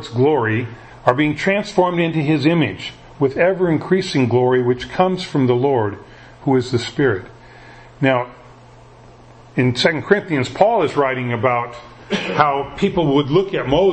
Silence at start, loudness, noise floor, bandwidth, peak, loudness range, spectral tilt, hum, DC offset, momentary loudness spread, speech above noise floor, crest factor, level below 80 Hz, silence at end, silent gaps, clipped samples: 0 s; -18 LUFS; -43 dBFS; 8.6 kHz; 0 dBFS; 4 LU; -6.5 dB/octave; none; under 0.1%; 8 LU; 26 dB; 18 dB; -48 dBFS; 0 s; none; under 0.1%